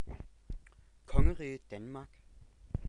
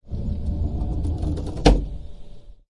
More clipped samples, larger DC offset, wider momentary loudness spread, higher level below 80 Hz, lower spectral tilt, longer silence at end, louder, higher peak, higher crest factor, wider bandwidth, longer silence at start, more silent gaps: neither; second, under 0.1% vs 0.5%; first, 19 LU vs 16 LU; second, -38 dBFS vs -26 dBFS; first, -8 dB/octave vs -6.5 dB/octave; about the same, 0 s vs 0 s; second, -38 LUFS vs -24 LUFS; second, -12 dBFS vs -2 dBFS; about the same, 22 dB vs 22 dB; second, 9.4 kHz vs 11 kHz; about the same, 0 s vs 0 s; neither